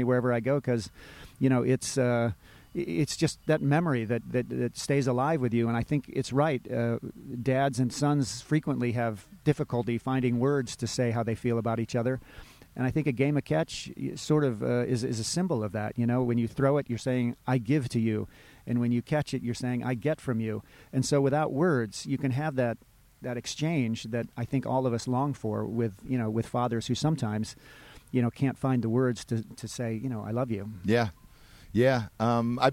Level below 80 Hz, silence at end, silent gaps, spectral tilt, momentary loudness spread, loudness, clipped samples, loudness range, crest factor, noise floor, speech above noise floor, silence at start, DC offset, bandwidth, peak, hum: -56 dBFS; 0 s; none; -6.5 dB/octave; 8 LU; -29 LUFS; under 0.1%; 2 LU; 20 dB; -53 dBFS; 25 dB; 0 s; under 0.1%; 16 kHz; -10 dBFS; none